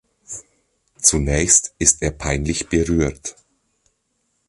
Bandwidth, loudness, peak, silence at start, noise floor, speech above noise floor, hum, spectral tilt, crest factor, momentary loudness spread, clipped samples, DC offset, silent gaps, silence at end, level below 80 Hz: 11.5 kHz; -17 LUFS; 0 dBFS; 0.3 s; -70 dBFS; 51 dB; none; -3.5 dB/octave; 22 dB; 20 LU; under 0.1%; under 0.1%; none; 1.2 s; -32 dBFS